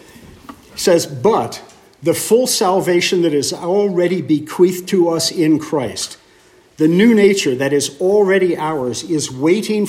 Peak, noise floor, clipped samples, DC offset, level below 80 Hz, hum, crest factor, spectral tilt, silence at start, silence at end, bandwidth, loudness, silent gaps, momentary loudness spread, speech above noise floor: 0 dBFS; -49 dBFS; under 0.1%; under 0.1%; -56 dBFS; none; 14 dB; -4.5 dB/octave; 0.2 s; 0 s; 16 kHz; -15 LUFS; none; 8 LU; 34 dB